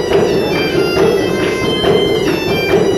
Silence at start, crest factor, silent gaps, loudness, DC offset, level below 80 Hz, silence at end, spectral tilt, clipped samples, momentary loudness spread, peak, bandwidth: 0 s; 12 dB; none; -13 LUFS; under 0.1%; -36 dBFS; 0 s; -5 dB/octave; under 0.1%; 2 LU; 0 dBFS; 15 kHz